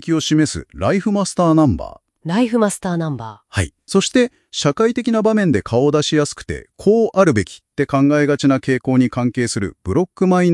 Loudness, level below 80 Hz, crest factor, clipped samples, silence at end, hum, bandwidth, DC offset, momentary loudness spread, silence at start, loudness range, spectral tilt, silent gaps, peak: -17 LUFS; -44 dBFS; 16 dB; under 0.1%; 0 s; none; 12 kHz; under 0.1%; 9 LU; 0.05 s; 2 LU; -5.5 dB/octave; none; 0 dBFS